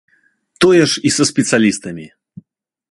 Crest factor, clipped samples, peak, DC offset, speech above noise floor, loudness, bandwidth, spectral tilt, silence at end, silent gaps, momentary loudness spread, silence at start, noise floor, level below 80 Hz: 16 dB; under 0.1%; 0 dBFS; under 0.1%; 43 dB; -13 LUFS; 11.5 kHz; -4 dB/octave; 0.85 s; none; 16 LU; 0.6 s; -57 dBFS; -54 dBFS